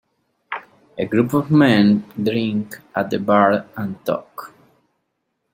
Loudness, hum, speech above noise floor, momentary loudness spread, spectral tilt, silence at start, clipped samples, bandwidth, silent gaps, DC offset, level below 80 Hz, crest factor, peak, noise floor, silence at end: -18 LUFS; none; 55 dB; 17 LU; -7.5 dB/octave; 0.5 s; under 0.1%; 16.5 kHz; none; under 0.1%; -60 dBFS; 18 dB; -2 dBFS; -73 dBFS; 1.05 s